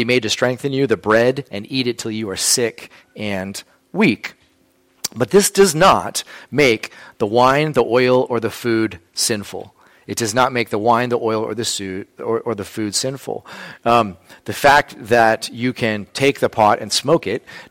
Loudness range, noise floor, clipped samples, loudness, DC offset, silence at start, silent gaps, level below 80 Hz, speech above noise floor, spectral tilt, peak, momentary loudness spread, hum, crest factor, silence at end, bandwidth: 5 LU; -58 dBFS; under 0.1%; -17 LUFS; under 0.1%; 0 s; none; -50 dBFS; 40 dB; -3.5 dB/octave; -2 dBFS; 14 LU; none; 16 dB; 0.05 s; 16.5 kHz